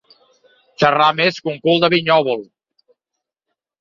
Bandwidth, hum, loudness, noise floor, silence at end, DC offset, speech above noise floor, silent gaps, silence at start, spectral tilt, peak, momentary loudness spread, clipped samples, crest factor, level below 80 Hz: 7.4 kHz; none; -16 LUFS; -81 dBFS; 1.35 s; under 0.1%; 66 dB; none; 0.8 s; -5.5 dB/octave; -2 dBFS; 8 LU; under 0.1%; 18 dB; -62 dBFS